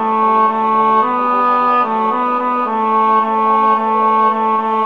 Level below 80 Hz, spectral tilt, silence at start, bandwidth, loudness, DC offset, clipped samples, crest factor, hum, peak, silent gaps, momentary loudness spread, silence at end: -68 dBFS; -7 dB/octave; 0 s; 5.6 kHz; -13 LUFS; 0.4%; under 0.1%; 12 dB; none; -2 dBFS; none; 3 LU; 0 s